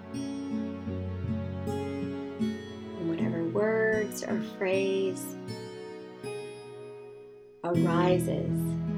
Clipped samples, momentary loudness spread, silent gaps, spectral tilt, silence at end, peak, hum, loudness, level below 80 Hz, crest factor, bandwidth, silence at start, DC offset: under 0.1%; 17 LU; none; -6.5 dB/octave; 0 s; -12 dBFS; none; -31 LUFS; -64 dBFS; 18 dB; 15.5 kHz; 0 s; under 0.1%